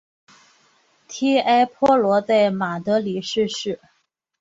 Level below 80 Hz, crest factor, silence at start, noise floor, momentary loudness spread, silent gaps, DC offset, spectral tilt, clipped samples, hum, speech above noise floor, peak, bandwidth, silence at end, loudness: -62 dBFS; 16 dB; 1.1 s; -60 dBFS; 11 LU; none; under 0.1%; -5 dB/octave; under 0.1%; none; 41 dB; -4 dBFS; 8 kHz; 0.65 s; -20 LUFS